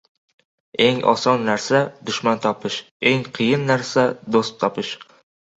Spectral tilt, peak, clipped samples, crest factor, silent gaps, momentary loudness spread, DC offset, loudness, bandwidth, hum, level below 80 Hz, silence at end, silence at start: -5 dB/octave; -2 dBFS; under 0.1%; 20 dB; 2.91-3.00 s; 9 LU; under 0.1%; -20 LUFS; 8.2 kHz; none; -62 dBFS; 0.55 s; 0.8 s